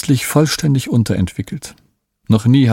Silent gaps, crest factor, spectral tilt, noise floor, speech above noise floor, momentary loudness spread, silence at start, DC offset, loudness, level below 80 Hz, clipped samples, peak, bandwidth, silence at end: none; 14 dB; -6 dB/octave; -42 dBFS; 27 dB; 15 LU; 0.05 s; under 0.1%; -15 LUFS; -42 dBFS; under 0.1%; 0 dBFS; 17 kHz; 0 s